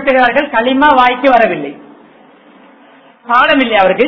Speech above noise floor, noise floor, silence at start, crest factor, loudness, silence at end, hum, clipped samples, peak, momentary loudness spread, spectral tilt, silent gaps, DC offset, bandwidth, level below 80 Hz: 33 dB; -42 dBFS; 0 s; 12 dB; -10 LUFS; 0 s; none; 0.3%; 0 dBFS; 6 LU; -6 dB/octave; none; under 0.1%; 6 kHz; -46 dBFS